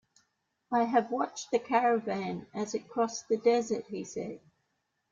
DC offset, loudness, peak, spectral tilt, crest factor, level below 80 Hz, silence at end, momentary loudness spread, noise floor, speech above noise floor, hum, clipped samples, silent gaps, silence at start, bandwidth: under 0.1%; -31 LUFS; -12 dBFS; -4.5 dB/octave; 20 dB; -76 dBFS; 0.75 s; 12 LU; -80 dBFS; 49 dB; none; under 0.1%; none; 0.7 s; 7.6 kHz